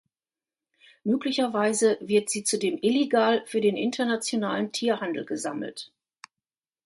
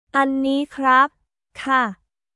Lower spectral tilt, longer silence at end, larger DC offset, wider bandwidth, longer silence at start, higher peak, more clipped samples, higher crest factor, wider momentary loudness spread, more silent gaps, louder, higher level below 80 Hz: about the same, -3.5 dB/octave vs -4.5 dB/octave; first, 1 s vs 0.4 s; neither; about the same, 12 kHz vs 11.5 kHz; first, 1.05 s vs 0.15 s; second, -8 dBFS vs -4 dBFS; neither; about the same, 18 dB vs 16 dB; about the same, 10 LU vs 8 LU; neither; second, -26 LUFS vs -19 LUFS; second, -74 dBFS vs -62 dBFS